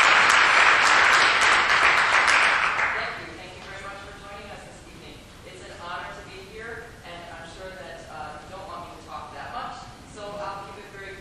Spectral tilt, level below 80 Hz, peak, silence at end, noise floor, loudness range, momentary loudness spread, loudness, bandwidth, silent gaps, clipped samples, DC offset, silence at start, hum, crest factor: -1 dB/octave; -52 dBFS; -2 dBFS; 0 s; -44 dBFS; 21 LU; 24 LU; -17 LUFS; 13.5 kHz; none; under 0.1%; under 0.1%; 0 s; none; 22 dB